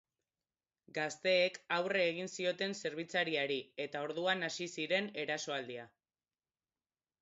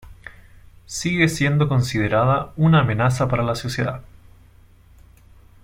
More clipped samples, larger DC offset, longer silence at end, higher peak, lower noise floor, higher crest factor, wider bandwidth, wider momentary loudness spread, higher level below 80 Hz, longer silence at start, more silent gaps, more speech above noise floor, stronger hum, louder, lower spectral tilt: neither; neither; second, 1.35 s vs 1.6 s; second, -18 dBFS vs -4 dBFS; first, under -90 dBFS vs -50 dBFS; about the same, 20 dB vs 18 dB; second, 7.6 kHz vs 16 kHz; about the same, 9 LU vs 10 LU; second, -86 dBFS vs -44 dBFS; first, 0.95 s vs 0.05 s; neither; first, over 53 dB vs 31 dB; neither; second, -36 LUFS vs -20 LUFS; second, -1.5 dB/octave vs -6 dB/octave